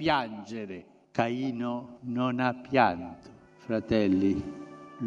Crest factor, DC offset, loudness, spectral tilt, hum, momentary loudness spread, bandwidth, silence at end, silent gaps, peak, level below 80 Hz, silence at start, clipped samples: 22 dB; under 0.1%; -29 LUFS; -7 dB/octave; none; 19 LU; 7.6 kHz; 0 s; none; -6 dBFS; -58 dBFS; 0 s; under 0.1%